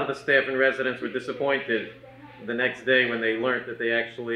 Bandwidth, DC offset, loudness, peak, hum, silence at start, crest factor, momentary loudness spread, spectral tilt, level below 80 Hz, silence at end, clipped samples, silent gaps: 10.5 kHz; under 0.1%; -25 LUFS; -6 dBFS; none; 0 s; 20 dB; 10 LU; -5 dB/octave; -68 dBFS; 0 s; under 0.1%; none